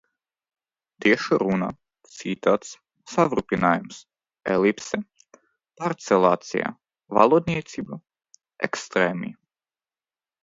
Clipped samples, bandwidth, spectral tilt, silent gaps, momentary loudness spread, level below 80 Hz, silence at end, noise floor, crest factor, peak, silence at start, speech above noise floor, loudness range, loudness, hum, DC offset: under 0.1%; 7.8 kHz; -5.5 dB/octave; none; 17 LU; -60 dBFS; 1.1 s; under -90 dBFS; 24 dB; 0 dBFS; 1 s; over 67 dB; 2 LU; -23 LUFS; none; under 0.1%